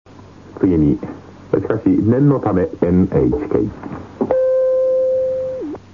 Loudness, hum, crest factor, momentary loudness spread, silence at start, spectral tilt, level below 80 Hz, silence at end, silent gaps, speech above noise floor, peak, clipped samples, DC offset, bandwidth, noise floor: -17 LUFS; none; 16 dB; 10 LU; 0.2 s; -11 dB/octave; -38 dBFS; 0.15 s; none; 24 dB; 0 dBFS; under 0.1%; 0.2%; 6.8 kHz; -40 dBFS